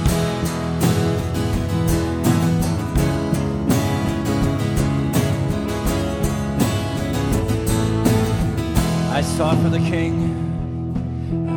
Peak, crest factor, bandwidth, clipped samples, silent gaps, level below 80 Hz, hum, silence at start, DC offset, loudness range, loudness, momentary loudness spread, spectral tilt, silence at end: -4 dBFS; 16 dB; 19.5 kHz; under 0.1%; none; -30 dBFS; none; 0 s; under 0.1%; 1 LU; -20 LUFS; 5 LU; -6 dB/octave; 0 s